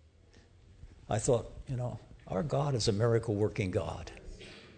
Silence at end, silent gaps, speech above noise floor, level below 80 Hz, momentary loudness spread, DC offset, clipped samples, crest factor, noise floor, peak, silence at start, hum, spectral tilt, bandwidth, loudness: 0 s; none; 29 dB; -52 dBFS; 18 LU; under 0.1%; under 0.1%; 18 dB; -60 dBFS; -16 dBFS; 0.85 s; none; -6 dB/octave; 9.4 kHz; -33 LUFS